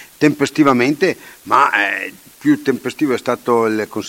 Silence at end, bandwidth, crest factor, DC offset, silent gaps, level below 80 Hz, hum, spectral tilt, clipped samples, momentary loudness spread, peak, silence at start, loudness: 0 s; 16.5 kHz; 16 dB; under 0.1%; none; -60 dBFS; none; -5 dB/octave; under 0.1%; 8 LU; 0 dBFS; 0 s; -16 LUFS